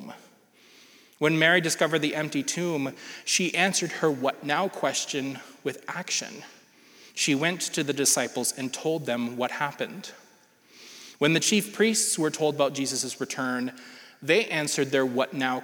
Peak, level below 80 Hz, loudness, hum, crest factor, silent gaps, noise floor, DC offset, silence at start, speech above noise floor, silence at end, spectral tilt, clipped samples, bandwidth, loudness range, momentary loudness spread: -6 dBFS; -84 dBFS; -26 LUFS; none; 22 dB; none; -58 dBFS; under 0.1%; 0 s; 32 dB; 0 s; -3 dB/octave; under 0.1%; over 20 kHz; 4 LU; 13 LU